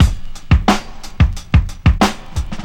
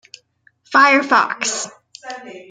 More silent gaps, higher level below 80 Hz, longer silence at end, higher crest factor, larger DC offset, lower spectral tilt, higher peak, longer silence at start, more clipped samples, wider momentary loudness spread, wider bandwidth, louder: neither; first, -18 dBFS vs -72 dBFS; about the same, 0 s vs 0.1 s; about the same, 14 dB vs 18 dB; neither; first, -6 dB/octave vs -1 dB/octave; about the same, -2 dBFS vs 0 dBFS; second, 0 s vs 0.7 s; neither; second, 12 LU vs 22 LU; first, 15 kHz vs 9.6 kHz; about the same, -16 LUFS vs -15 LUFS